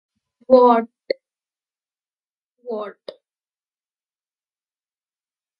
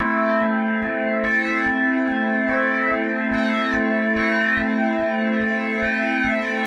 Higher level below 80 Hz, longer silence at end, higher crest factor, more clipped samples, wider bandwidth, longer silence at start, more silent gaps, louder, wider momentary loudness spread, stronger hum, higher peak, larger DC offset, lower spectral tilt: second, -70 dBFS vs -48 dBFS; first, 2.7 s vs 0 s; first, 24 dB vs 12 dB; neither; second, 5.2 kHz vs 8.6 kHz; first, 0.5 s vs 0 s; first, 2.29-2.57 s vs none; first, -17 LUFS vs -20 LUFS; first, 18 LU vs 3 LU; neither; first, 0 dBFS vs -8 dBFS; neither; first, -8 dB/octave vs -6 dB/octave